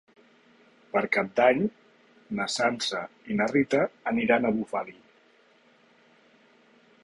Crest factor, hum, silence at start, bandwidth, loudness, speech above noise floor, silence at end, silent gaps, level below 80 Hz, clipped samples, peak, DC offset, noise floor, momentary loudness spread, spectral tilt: 20 dB; none; 0.95 s; 11.5 kHz; -26 LUFS; 35 dB; 2.1 s; none; -66 dBFS; under 0.1%; -8 dBFS; under 0.1%; -61 dBFS; 11 LU; -4.5 dB/octave